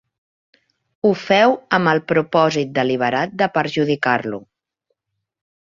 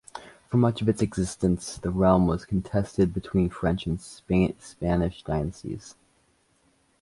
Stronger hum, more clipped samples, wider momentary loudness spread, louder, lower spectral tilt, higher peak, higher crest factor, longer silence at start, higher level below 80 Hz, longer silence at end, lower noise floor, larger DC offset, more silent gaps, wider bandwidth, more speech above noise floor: neither; neither; second, 6 LU vs 11 LU; first, -18 LUFS vs -26 LUFS; about the same, -6 dB/octave vs -7 dB/octave; first, -2 dBFS vs -6 dBFS; about the same, 18 dB vs 20 dB; first, 1.05 s vs 0.15 s; second, -62 dBFS vs -42 dBFS; first, 1.4 s vs 1.1 s; first, -76 dBFS vs -66 dBFS; neither; neither; second, 7.4 kHz vs 11.5 kHz; first, 59 dB vs 41 dB